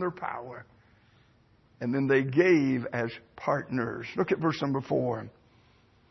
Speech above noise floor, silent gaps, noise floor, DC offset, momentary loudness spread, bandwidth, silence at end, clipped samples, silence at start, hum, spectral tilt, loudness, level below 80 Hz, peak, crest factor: 35 dB; none; -63 dBFS; under 0.1%; 14 LU; 6.2 kHz; 0.8 s; under 0.1%; 0 s; none; -7.5 dB/octave; -28 LUFS; -66 dBFS; -10 dBFS; 20 dB